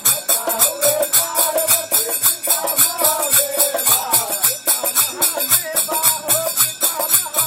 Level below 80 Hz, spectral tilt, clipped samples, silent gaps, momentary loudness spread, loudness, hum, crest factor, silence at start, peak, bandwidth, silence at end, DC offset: -64 dBFS; 0.5 dB/octave; under 0.1%; none; 3 LU; -14 LUFS; none; 18 dB; 0 s; 0 dBFS; 17 kHz; 0 s; under 0.1%